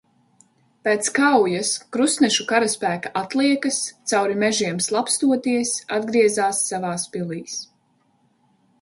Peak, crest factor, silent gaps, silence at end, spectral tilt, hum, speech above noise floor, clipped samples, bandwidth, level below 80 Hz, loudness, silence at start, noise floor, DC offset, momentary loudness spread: -4 dBFS; 18 dB; none; 1.15 s; -3 dB/octave; none; 43 dB; under 0.1%; 11.5 kHz; -68 dBFS; -21 LUFS; 0.85 s; -64 dBFS; under 0.1%; 9 LU